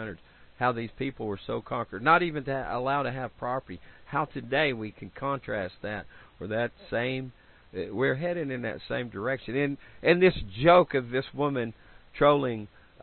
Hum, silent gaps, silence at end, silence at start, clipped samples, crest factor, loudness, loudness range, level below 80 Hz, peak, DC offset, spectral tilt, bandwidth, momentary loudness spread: none; none; 0.35 s; 0 s; under 0.1%; 22 dB; -28 LUFS; 7 LU; -54 dBFS; -8 dBFS; under 0.1%; -10 dB/octave; 4.4 kHz; 15 LU